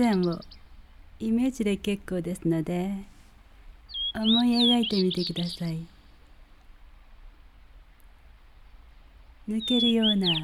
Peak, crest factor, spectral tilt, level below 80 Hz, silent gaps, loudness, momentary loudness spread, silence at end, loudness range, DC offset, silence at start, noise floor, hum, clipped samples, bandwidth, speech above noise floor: -12 dBFS; 16 dB; -5.5 dB/octave; -50 dBFS; none; -26 LUFS; 15 LU; 0 s; 12 LU; under 0.1%; 0 s; -52 dBFS; none; under 0.1%; 14 kHz; 27 dB